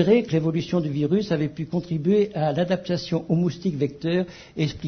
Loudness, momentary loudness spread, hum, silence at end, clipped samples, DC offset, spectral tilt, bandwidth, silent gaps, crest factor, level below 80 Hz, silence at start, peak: -24 LUFS; 6 LU; none; 0 s; under 0.1%; under 0.1%; -7.5 dB/octave; 6.6 kHz; none; 18 dB; -54 dBFS; 0 s; -6 dBFS